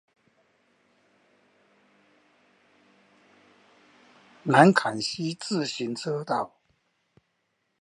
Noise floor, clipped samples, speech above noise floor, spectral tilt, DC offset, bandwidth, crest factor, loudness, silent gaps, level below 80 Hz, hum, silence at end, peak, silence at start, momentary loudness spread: -76 dBFS; under 0.1%; 52 dB; -5 dB/octave; under 0.1%; 11.5 kHz; 28 dB; -25 LUFS; none; -76 dBFS; none; 1.35 s; -2 dBFS; 4.45 s; 14 LU